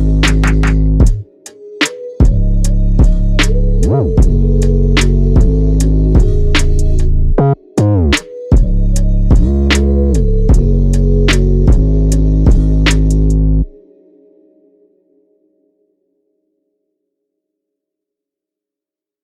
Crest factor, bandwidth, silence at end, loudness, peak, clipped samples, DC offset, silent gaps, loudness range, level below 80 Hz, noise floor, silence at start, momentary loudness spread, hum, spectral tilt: 10 dB; 11.5 kHz; 5.55 s; -13 LUFS; 0 dBFS; under 0.1%; under 0.1%; none; 3 LU; -12 dBFS; -87 dBFS; 0 s; 4 LU; none; -6 dB/octave